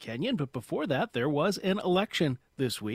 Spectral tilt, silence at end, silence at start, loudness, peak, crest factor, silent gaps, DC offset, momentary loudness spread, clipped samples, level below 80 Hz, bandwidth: -5.5 dB/octave; 0 s; 0 s; -30 LUFS; -12 dBFS; 18 dB; none; under 0.1%; 6 LU; under 0.1%; -64 dBFS; 16 kHz